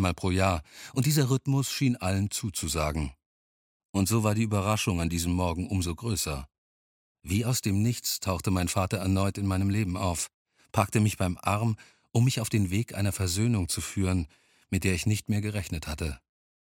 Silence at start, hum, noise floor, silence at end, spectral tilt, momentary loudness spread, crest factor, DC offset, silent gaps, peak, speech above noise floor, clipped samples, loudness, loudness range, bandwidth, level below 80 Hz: 0 s; none; under -90 dBFS; 0.55 s; -5 dB/octave; 8 LU; 22 dB; under 0.1%; 3.26-3.94 s, 6.58-7.15 s, 10.34-10.45 s; -6 dBFS; over 63 dB; under 0.1%; -28 LUFS; 2 LU; 17.5 kHz; -46 dBFS